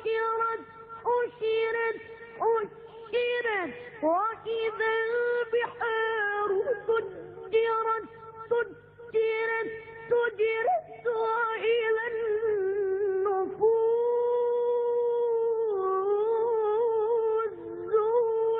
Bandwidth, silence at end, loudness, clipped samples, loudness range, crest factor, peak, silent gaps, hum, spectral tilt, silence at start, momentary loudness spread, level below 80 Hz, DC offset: 4.7 kHz; 0 s; -28 LUFS; under 0.1%; 3 LU; 14 dB; -14 dBFS; none; 50 Hz at -65 dBFS; -7.5 dB/octave; 0 s; 7 LU; -70 dBFS; under 0.1%